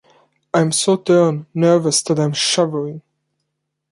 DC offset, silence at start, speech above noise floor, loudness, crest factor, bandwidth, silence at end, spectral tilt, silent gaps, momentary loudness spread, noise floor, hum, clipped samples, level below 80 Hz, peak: under 0.1%; 0.55 s; 59 dB; -16 LUFS; 16 dB; 11.5 kHz; 0.95 s; -4.5 dB/octave; none; 7 LU; -75 dBFS; none; under 0.1%; -64 dBFS; -2 dBFS